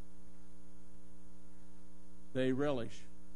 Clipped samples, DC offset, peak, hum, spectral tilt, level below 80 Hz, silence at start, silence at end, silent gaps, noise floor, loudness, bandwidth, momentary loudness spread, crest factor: under 0.1%; 1%; -24 dBFS; none; -6.5 dB/octave; -64 dBFS; 0 s; 0.15 s; none; -60 dBFS; -38 LUFS; 10.5 kHz; 26 LU; 22 dB